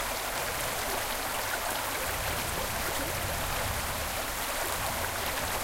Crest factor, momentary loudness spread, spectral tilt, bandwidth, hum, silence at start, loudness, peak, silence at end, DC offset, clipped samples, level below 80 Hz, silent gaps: 16 dB; 1 LU; -2 dB/octave; 16.5 kHz; none; 0 s; -31 LUFS; -16 dBFS; 0 s; under 0.1%; under 0.1%; -44 dBFS; none